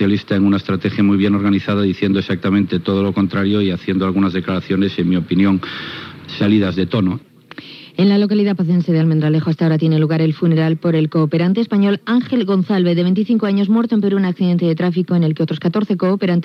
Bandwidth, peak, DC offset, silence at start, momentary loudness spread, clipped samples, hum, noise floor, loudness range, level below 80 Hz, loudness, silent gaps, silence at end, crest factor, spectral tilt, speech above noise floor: 6 kHz; -4 dBFS; under 0.1%; 0 s; 4 LU; under 0.1%; none; -37 dBFS; 2 LU; -62 dBFS; -16 LUFS; none; 0 s; 12 dB; -9 dB/octave; 21 dB